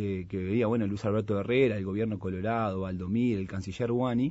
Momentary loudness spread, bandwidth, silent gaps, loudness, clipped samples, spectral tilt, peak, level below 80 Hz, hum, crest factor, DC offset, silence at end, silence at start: 7 LU; 8 kHz; none; -30 LUFS; under 0.1%; -8 dB/octave; -12 dBFS; -56 dBFS; none; 16 dB; under 0.1%; 0 s; 0 s